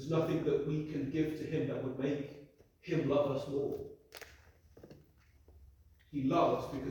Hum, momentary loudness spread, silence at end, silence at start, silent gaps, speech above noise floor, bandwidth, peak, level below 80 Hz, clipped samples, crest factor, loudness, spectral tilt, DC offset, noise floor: none; 20 LU; 0 s; 0 s; none; 30 dB; 20 kHz; -18 dBFS; -62 dBFS; under 0.1%; 18 dB; -35 LUFS; -7.5 dB/octave; under 0.1%; -64 dBFS